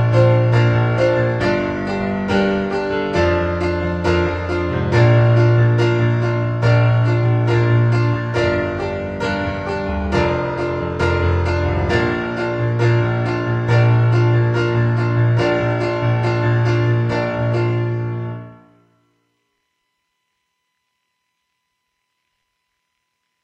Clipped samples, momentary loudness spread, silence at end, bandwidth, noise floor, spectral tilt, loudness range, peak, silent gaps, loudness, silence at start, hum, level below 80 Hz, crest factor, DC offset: under 0.1%; 8 LU; 4.9 s; 7.4 kHz; -73 dBFS; -8 dB/octave; 5 LU; -2 dBFS; none; -17 LUFS; 0 s; none; -36 dBFS; 16 dB; under 0.1%